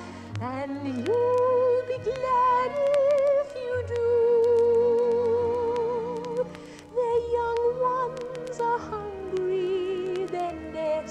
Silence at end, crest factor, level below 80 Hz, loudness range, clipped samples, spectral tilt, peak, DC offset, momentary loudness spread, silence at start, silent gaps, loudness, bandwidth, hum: 0 s; 14 dB; -58 dBFS; 5 LU; under 0.1%; -6.5 dB/octave; -10 dBFS; under 0.1%; 11 LU; 0 s; none; -26 LUFS; 9.4 kHz; none